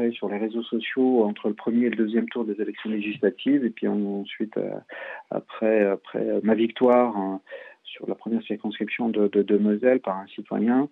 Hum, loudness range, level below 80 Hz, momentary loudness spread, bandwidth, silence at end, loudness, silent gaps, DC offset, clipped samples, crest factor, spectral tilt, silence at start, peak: none; 2 LU; -80 dBFS; 12 LU; 4.1 kHz; 0.05 s; -25 LUFS; none; under 0.1%; under 0.1%; 16 dB; -9 dB/octave; 0 s; -8 dBFS